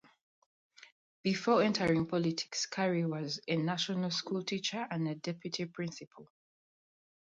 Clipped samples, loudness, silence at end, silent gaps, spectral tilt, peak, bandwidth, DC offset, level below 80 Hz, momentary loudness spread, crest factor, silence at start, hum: under 0.1%; -34 LUFS; 0.95 s; 0.92-1.24 s, 6.07-6.11 s; -5 dB/octave; -16 dBFS; 9.2 kHz; under 0.1%; -72 dBFS; 10 LU; 18 dB; 0.8 s; none